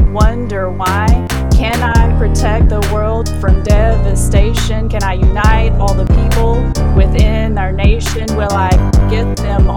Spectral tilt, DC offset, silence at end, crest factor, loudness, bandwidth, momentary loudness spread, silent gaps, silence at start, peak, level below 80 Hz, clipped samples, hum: -6 dB/octave; 5%; 0 s; 10 dB; -13 LUFS; 18 kHz; 4 LU; none; 0 s; 0 dBFS; -12 dBFS; under 0.1%; none